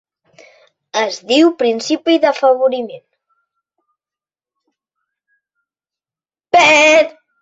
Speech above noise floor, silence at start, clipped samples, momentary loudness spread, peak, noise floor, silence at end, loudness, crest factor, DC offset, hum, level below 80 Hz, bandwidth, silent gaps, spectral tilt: over 77 dB; 0.95 s; under 0.1%; 13 LU; 0 dBFS; under -90 dBFS; 0.3 s; -13 LUFS; 16 dB; under 0.1%; none; -64 dBFS; 8 kHz; none; -2 dB/octave